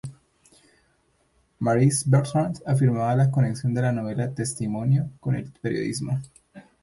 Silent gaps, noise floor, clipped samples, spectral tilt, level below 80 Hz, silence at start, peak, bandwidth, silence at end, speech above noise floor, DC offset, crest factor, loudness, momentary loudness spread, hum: none; -66 dBFS; under 0.1%; -6.5 dB/octave; -58 dBFS; 0.05 s; -8 dBFS; 11.5 kHz; 0.2 s; 43 dB; under 0.1%; 16 dB; -24 LUFS; 8 LU; none